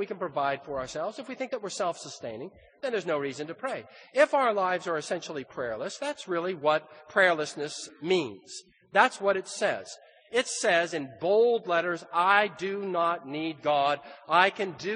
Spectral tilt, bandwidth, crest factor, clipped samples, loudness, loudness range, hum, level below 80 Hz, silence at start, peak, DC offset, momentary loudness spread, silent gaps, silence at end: -3.5 dB/octave; 10 kHz; 24 dB; under 0.1%; -28 LUFS; 6 LU; none; -72 dBFS; 0 s; -6 dBFS; under 0.1%; 14 LU; none; 0 s